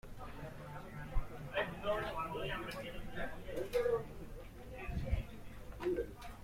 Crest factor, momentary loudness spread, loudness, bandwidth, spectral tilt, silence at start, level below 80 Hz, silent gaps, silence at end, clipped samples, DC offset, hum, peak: 20 dB; 14 LU; -42 LUFS; 16.5 kHz; -6 dB/octave; 0.05 s; -48 dBFS; none; 0 s; under 0.1%; under 0.1%; none; -22 dBFS